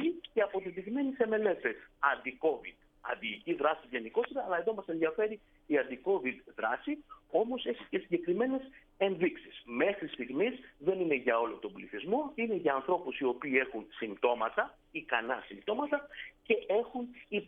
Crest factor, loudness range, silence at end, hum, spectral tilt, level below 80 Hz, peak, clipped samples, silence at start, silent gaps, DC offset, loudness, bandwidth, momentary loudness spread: 22 dB; 2 LU; 0 s; none; -8 dB/octave; -68 dBFS; -12 dBFS; under 0.1%; 0 s; none; under 0.1%; -34 LUFS; 3.9 kHz; 10 LU